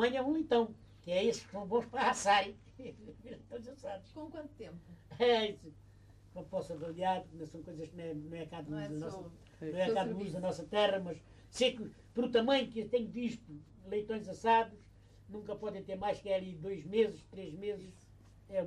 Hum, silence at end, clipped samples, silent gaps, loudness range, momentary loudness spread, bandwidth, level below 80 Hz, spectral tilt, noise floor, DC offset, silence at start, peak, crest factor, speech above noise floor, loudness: none; 0 s; under 0.1%; none; 6 LU; 20 LU; 11.5 kHz; -64 dBFS; -4.5 dB/octave; -59 dBFS; under 0.1%; 0 s; -18 dBFS; 18 dB; 23 dB; -35 LUFS